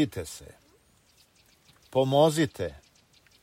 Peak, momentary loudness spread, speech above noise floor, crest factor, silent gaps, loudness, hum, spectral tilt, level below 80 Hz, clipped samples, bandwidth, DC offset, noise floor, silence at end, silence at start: -8 dBFS; 18 LU; 37 dB; 22 dB; none; -26 LUFS; none; -5.5 dB/octave; -58 dBFS; under 0.1%; 16 kHz; under 0.1%; -63 dBFS; 0.7 s; 0 s